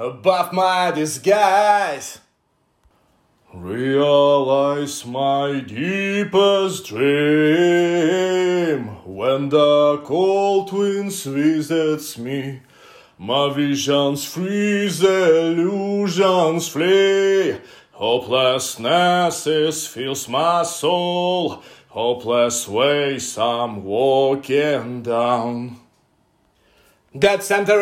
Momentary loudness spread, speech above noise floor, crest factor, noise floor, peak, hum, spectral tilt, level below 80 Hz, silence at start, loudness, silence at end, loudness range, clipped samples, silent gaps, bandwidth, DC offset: 10 LU; 47 dB; 16 dB; -65 dBFS; -4 dBFS; none; -4.5 dB/octave; -64 dBFS; 0 s; -18 LUFS; 0 s; 4 LU; under 0.1%; none; 16 kHz; under 0.1%